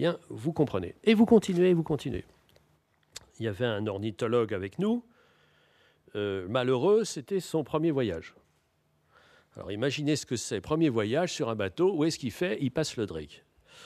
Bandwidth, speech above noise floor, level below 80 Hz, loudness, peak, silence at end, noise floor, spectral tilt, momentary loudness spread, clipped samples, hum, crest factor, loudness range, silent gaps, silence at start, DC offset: 14.5 kHz; 43 dB; -60 dBFS; -29 LUFS; -8 dBFS; 0 s; -71 dBFS; -6 dB/octave; 12 LU; under 0.1%; none; 20 dB; 5 LU; none; 0 s; under 0.1%